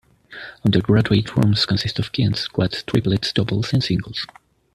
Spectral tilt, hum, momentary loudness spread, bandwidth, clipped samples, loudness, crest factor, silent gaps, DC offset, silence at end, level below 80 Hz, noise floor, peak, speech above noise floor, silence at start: -6.5 dB/octave; none; 12 LU; 12.5 kHz; under 0.1%; -20 LUFS; 18 dB; none; under 0.1%; 0.5 s; -46 dBFS; -39 dBFS; -2 dBFS; 20 dB; 0.3 s